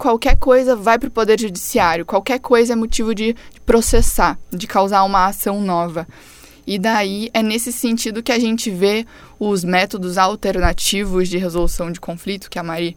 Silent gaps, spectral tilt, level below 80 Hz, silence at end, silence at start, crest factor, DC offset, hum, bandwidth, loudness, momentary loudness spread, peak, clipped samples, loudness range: none; -4 dB/octave; -26 dBFS; 0.05 s; 0 s; 16 dB; under 0.1%; none; 18 kHz; -17 LUFS; 11 LU; 0 dBFS; under 0.1%; 3 LU